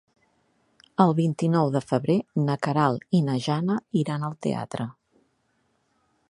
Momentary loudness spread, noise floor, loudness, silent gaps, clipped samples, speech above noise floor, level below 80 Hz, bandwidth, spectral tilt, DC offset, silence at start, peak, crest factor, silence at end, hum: 8 LU; -70 dBFS; -25 LUFS; none; under 0.1%; 46 dB; -66 dBFS; 11 kHz; -7.5 dB/octave; under 0.1%; 1 s; -4 dBFS; 22 dB; 1.4 s; none